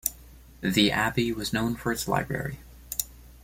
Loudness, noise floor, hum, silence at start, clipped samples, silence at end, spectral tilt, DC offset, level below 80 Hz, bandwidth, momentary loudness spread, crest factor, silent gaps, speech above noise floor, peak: -27 LUFS; -49 dBFS; none; 0.05 s; under 0.1%; 0.05 s; -4 dB/octave; under 0.1%; -48 dBFS; 16.5 kHz; 11 LU; 22 dB; none; 23 dB; -6 dBFS